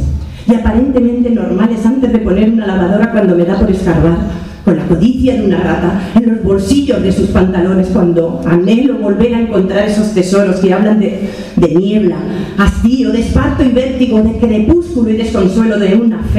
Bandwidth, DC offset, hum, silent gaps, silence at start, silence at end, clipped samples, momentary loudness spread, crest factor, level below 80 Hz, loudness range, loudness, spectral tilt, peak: 11.5 kHz; 0.3%; none; none; 0 s; 0 s; under 0.1%; 3 LU; 10 dB; -24 dBFS; 1 LU; -11 LUFS; -7.5 dB/octave; 0 dBFS